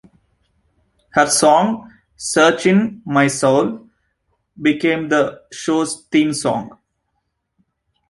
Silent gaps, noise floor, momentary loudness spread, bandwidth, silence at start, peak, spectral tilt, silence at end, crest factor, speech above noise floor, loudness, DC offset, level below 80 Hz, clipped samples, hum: none; -72 dBFS; 12 LU; 11.5 kHz; 1.15 s; 0 dBFS; -4 dB/octave; 1.4 s; 18 dB; 56 dB; -17 LUFS; under 0.1%; -58 dBFS; under 0.1%; none